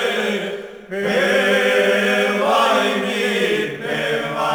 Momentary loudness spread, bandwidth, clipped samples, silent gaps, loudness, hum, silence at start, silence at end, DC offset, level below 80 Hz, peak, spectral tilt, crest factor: 9 LU; over 20 kHz; under 0.1%; none; -18 LUFS; none; 0 s; 0 s; under 0.1%; -60 dBFS; -4 dBFS; -4 dB/octave; 14 dB